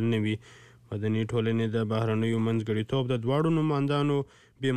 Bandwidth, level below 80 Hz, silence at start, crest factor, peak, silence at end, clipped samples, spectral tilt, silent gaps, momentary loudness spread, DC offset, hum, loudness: 9.8 kHz; -60 dBFS; 0 s; 12 dB; -16 dBFS; 0 s; under 0.1%; -8 dB/octave; none; 7 LU; 0.2%; none; -28 LUFS